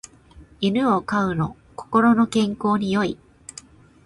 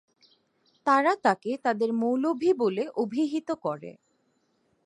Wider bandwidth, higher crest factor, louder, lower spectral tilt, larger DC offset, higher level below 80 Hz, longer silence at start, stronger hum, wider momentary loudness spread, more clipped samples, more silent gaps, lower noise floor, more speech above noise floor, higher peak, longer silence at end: about the same, 11.5 kHz vs 11 kHz; about the same, 18 dB vs 20 dB; first, -21 LUFS vs -26 LUFS; about the same, -6 dB/octave vs -6 dB/octave; neither; first, -52 dBFS vs -78 dBFS; second, 0.35 s vs 0.85 s; neither; first, 22 LU vs 9 LU; neither; neither; second, -48 dBFS vs -71 dBFS; second, 28 dB vs 45 dB; about the same, -6 dBFS vs -8 dBFS; about the same, 0.9 s vs 0.95 s